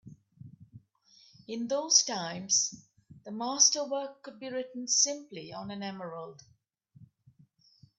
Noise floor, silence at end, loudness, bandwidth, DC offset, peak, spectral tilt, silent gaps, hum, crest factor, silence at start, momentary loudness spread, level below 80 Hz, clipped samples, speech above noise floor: -64 dBFS; 0.95 s; -28 LUFS; 8.4 kHz; under 0.1%; -8 dBFS; -1 dB/octave; none; none; 26 dB; 0.05 s; 20 LU; -78 dBFS; under 0.1%; 32 dB